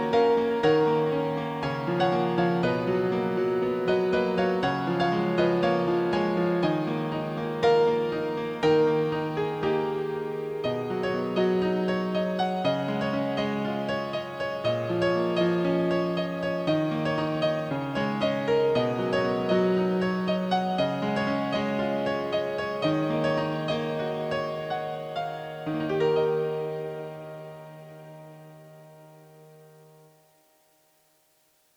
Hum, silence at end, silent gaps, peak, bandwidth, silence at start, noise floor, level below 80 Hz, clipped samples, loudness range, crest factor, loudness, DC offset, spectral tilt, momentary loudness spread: none; 2.3 s; none; -10 dBFS; 19.5 kHz; 0 s; -66 dBFS; -60 dBFS; under 0.1%; 5 LU; 16 dB; -26 LUFS; under 0.1%; -7 dB/octave; 8 LU